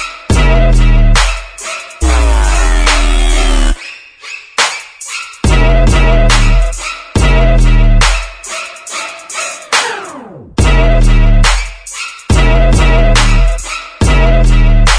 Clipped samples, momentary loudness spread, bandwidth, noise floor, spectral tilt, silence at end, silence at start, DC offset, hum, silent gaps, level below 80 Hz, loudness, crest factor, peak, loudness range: under 0.1%; 12 LU; 10.5 kHz; -30 dBFS; -4.5 dB/octave; 0 s; 0 s; under 0.1%; none; none; -10 dBFS; -12 LUFS; 8 dB; 0 dBFS; 3 LU